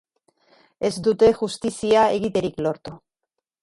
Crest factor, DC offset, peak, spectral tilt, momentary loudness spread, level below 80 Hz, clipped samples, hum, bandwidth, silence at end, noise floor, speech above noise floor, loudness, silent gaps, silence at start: 16 dB; under 0.1%; -6 dBFS; -5 dB/octave; 10 LU; -52 dBFS; under 0.1%; none; 11.5 kHz; 0.65 s; -82 dBFS; 61 dB; -21 LUFS; none; 0.8 s